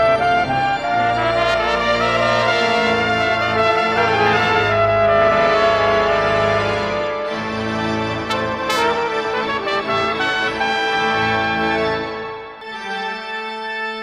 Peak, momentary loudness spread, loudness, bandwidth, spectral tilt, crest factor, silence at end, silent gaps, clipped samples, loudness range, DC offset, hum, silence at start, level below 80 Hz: -2 dBFS; 9 LU; -17 LUFS; 14.5 kHz; -4.5 dB/octave; 16 dB; 0 s; none; under 0.1%; 5 LU; under 0.1%; none; 0 s; -44 dBFS